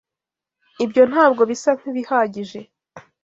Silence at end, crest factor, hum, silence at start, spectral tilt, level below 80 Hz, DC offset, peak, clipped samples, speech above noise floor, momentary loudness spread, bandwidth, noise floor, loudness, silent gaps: 0.25 s; 18 dB; none; 0.8 s; -5 dB/octave; -68 dBFS; under 0.1%; -2 dBFS; under 0.1%; 69 dB; 18 LU; 7.8 kHz; -87 dBFS; -18 LUFS; none